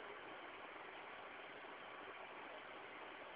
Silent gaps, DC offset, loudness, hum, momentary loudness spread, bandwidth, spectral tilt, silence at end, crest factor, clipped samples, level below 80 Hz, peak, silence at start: none; under 0.1%; -53 LUFS; none; 1 LU; 4 kHz; -0.5 dB/octave; 0 s; 16 dB; under 0.1%; -86 dBFS; -38 dBFS; 0 s